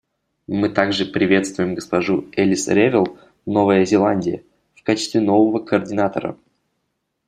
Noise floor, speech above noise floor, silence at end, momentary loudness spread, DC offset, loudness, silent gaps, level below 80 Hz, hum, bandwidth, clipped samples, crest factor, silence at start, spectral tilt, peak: -73 dBFS; 56 dB; 0.95 s; 11 LU; under 0.1%; -19 LUFS; none; -58 dBFS; none; 10.5 kHz; under 0.1%; 18 dB; 0.5 s; -5.5 dB/octave; 0 dBFS